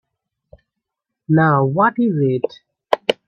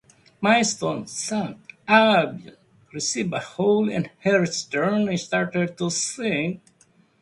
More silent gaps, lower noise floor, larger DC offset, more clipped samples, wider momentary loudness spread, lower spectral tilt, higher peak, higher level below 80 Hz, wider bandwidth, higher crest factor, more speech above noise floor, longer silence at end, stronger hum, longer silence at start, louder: neither; first, -81 dBFS vs -59 dBFS; neither; neither; about the same, 8 LU vs 10 LU; first, -8 dB/octave vs -4 dB/octave; about the same, 0 dBFS vs -2 dBFS; about the same, -60 dBFS vs -64 dBFS; second, 8.6 kHz vs 11.5 kHz; about the same, 20 dB vs 20 dB; first, 65 dB vs 37 dB; second, 0.15 s vs 0.65 s; neither; first, 1.3 s vs 0.4 s; first, -17 LUFS vs -22 LUFS